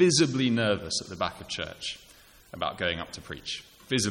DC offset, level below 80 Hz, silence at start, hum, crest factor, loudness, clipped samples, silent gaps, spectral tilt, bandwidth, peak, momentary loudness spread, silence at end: under 0.1%; -56 dBFS; 0 s; none; 18 dB; -29 LUFS; under 0.1%; none; -4 dB/octave; 16.5 kHz; -10 dBFS; 14 LU; 0 s